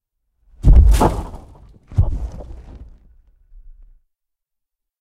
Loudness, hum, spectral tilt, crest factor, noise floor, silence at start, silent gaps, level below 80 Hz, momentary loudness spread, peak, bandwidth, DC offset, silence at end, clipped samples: -17 LUFS; none; -7.5 dB/octave; 18 dB; -81 dBFS; 0.65 s; none; -20 dBFS; 26 LU; 0 dBFS; 13.5 kHz; under 0.1%; 2.4 s; under 0.1%